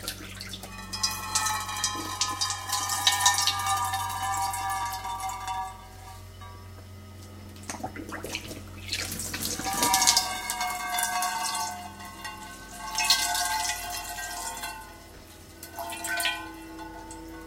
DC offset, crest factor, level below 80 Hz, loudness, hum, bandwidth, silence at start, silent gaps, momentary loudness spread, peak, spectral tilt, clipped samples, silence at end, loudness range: under 0.1%; 28 dB; -52 dBFS; -28 LUFS; none; 17 kHz; 0 s; none; 22 LU; -2 dBFS; -0.5 dB/octave; under 0.1%; 0 s; 11 LU